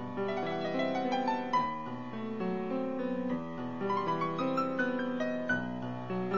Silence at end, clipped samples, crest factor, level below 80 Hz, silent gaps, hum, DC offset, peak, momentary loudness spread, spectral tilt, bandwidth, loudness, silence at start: 0 s; under 0.1%; 14 dB; -66 dBFS; none; none; 0.4%; -18 dBFS; 6 LU; -7 dB/octave; 7.4 kHz; -34 LUFS; 0 s